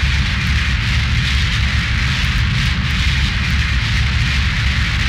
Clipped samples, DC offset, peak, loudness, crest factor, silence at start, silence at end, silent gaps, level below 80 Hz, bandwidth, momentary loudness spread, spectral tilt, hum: under 0.1%; under 0.1%; -4 dBFS; -16 LUFS; 12 dB; 0 s; 0 s; none; -20 dBFS; 12.5 kHz; 1 LU; -4 dB/octave; none